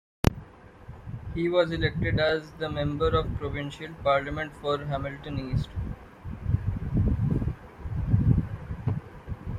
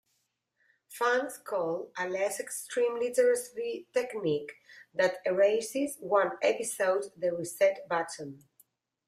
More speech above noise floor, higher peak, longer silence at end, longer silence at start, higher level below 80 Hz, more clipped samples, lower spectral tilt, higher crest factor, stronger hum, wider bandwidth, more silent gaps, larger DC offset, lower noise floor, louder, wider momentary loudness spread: second, 21 dB vs 48 dB; first, -2 dBFS vs -14 dBFS; second, 0 s vs 0.7 s; second, 0.25 s vs 0.9 s; first, -38 dBFS vs -80 dBFS; neither; first, -7.5 dB/octave vs -3.5 dB/octave; first, 26 dB vs 18 dB; neither; about the same, 15.5 kHz vs 15.5 kHz; neither; neither; second, -48 dBFS vs -78 dBFS; about the same, -29 LUFS vs -30 LUFS; first, 15 LU vs 10 LU